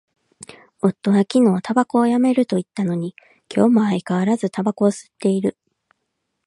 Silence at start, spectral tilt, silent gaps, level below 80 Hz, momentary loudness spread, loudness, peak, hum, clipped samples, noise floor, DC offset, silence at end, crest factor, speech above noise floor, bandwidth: 0.4 s; -7 dB/octave; none; -66 dBFS; 8 LU; -19 LUFS; -2 dBFS; none; under 0.1%; -75 dBFS; under 0.1%; 0.95 s; 18 dB; 57 dB; 11.5 kHz